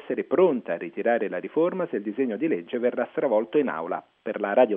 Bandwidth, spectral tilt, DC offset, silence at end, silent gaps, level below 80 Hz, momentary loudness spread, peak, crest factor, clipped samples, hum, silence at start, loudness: 3.8 kHz; -5 dB/octave; under 0.1%; 0 s; none; -82 dBFS; 9 LU; -6 dBFS; 18 dB; under 0.1%; none; 0 s; -26 LUFS